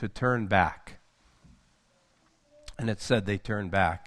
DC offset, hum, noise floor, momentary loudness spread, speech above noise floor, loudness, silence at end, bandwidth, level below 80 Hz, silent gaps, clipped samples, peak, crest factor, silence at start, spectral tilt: under 0.1%; none; -67 dBFS; 10 LU; 39 dB; -28 LUFS; 0 s; 12 kHz; -52 dBFS; none; under 0.1%; -6 dBFS; 24 dB; 0 s; -6 dB/octave